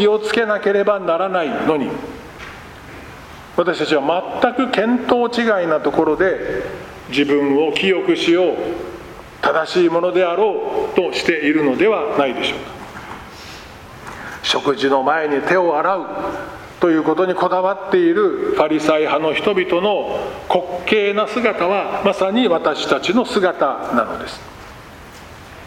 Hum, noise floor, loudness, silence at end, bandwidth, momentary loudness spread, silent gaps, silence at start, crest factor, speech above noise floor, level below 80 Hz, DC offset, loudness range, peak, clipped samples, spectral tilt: none; -38 dBFS; -17 LUFS; 0 s; 15.5 kHz; 18 LU; none; 0 s; 18 dB; 21 dB; -50 dBFS; under 0.1%; 4 LU; 0 dBFS; under 0.1%; -5 dB/octave